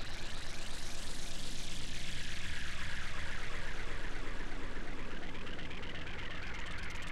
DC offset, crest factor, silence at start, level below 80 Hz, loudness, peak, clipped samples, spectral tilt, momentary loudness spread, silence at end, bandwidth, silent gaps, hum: under 0.1%; 10 dB; 0 s; -42 dBFS; -43 LUFS; -24 dBFS; under 0.1%; -3 dB/octave; 3 LU; 0 s; 11.5 kHz; none; none